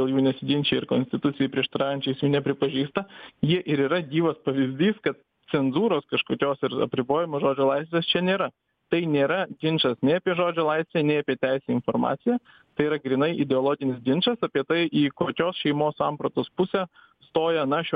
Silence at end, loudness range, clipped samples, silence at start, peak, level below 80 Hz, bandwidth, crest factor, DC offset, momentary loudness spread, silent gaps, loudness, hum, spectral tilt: 0 s; 1 LU; under 0.1%; 0 s; -8 dBFS; -64 dBFS; 5 kHz; 18 dB; under 0.1%; 5 LU; none; -25 LUFS; none; -9 dB/octave